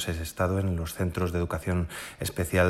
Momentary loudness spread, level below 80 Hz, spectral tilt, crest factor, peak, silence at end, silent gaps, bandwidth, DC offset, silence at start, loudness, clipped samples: 6 LU; -42 dBFS; -5.5 dB/octave; 18 dB; -10 dBFS; 0 s; none; 15.5 kHz; under 0.1%; 0 s; -30 LUFS; under 0.1%